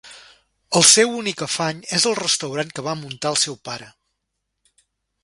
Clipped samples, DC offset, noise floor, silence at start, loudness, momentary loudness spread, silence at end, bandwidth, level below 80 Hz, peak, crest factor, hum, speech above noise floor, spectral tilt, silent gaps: under 0.1%; under 0.1%; -77 dBFS; 0.05 s; -18 LUFS; 16 LU; 1.35 s; 11.5 kHz; -62 dBFS; 0 dBFS; 22 dB; none; 57 dB; -2 dB/octave; none